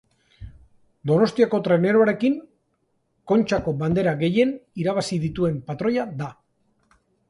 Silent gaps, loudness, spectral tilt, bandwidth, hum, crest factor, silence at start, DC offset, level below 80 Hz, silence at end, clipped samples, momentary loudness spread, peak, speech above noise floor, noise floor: none; -22 LUFS; -7 dB/octave; 11.5 kHz; none; 18 dB; 0.4 s; under 0.1%; -52 dBFS; 0.95 s; under 0.1%; 9 LU; -6 dBFS; 49 dB; -70 dBFS